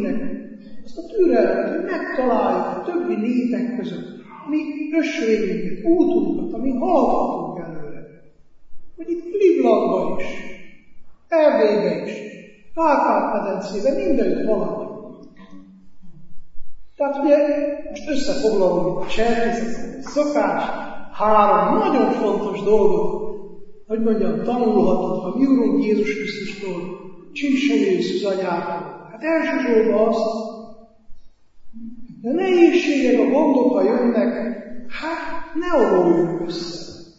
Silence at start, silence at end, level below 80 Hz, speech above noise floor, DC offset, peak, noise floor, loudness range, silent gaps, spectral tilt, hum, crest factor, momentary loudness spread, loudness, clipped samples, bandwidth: 0 s; 0.1 s; -46 dBFS; 28 dB; under 0.1%; -2 dBFS; -46 dBFS; 4 LU; none; -6.5 dB/octave; none; 18 dB; 17 LU; -20 LUFS; under 0.1%; 7.8 kHz